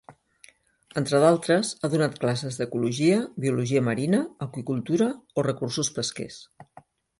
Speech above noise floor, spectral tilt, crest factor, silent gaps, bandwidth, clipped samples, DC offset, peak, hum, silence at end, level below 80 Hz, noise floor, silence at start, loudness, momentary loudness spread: 32 dB; -5.5 dB/octave; 20 dB; none; 11.5 kHz; under 0.1%; under 0.1%; -6 dBFS; none; 0.55 s; -64 dBFS; -57 dBFS; 0.1 s; -25 LUFS; 11 LU